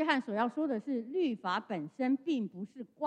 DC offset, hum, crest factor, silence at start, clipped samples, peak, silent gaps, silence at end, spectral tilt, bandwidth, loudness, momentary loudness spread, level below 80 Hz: under 0.1%; none; 20 dB; 0 s; under 0.1%; -14 dBFS; none; 0 s; -6.5 dB/octave; 8.8 kHz; -34 LUFS; 9 LU; -84 dBFS